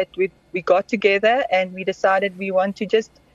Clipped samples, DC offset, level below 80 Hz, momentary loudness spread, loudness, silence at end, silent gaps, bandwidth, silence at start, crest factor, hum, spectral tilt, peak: under 0.1%; under 0.1%; -60 dBFS; 7 LU; -20 LUFS; 0.3 s; none; 7.8 kHz; 0 s; 16 dB; none; -5 dB/octave; -4 dBFS